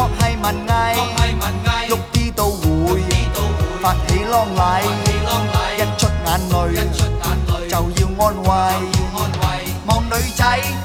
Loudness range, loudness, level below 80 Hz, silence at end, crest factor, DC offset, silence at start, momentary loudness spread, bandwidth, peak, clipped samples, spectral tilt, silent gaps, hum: 1 LU; -18 LUFS; -24 dBFS; 0 s; 16 dB; under 0.1%; 0 s; 3 LU; 17.5 kHz; 0 dBFS; under 0.1%; -5 dB/octave; none; none